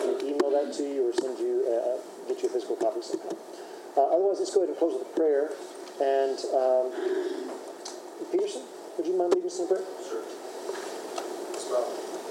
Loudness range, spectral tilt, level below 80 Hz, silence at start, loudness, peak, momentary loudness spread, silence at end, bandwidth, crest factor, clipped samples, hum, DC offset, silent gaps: 4 LU; -3 dB/octave; under -90 dBFS; 0 s; -29 LUFS; -10 dBFS; 13 LU; 0 s; 16 kHz; 20 dB; under 0.1%; none; under 0.1%; none